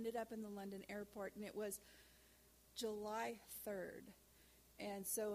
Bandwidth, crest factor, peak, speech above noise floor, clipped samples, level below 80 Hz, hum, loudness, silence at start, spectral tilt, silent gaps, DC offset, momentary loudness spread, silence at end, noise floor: 15.5 kHz; 18 dB; -30 dBFS; 22 dB; under 0.1%; -76 dBFS; none; -49 LUFS; 0 s; -3.5 dB/octave; none; under 0.1%; 21 LU; 0 s; -70 dBFS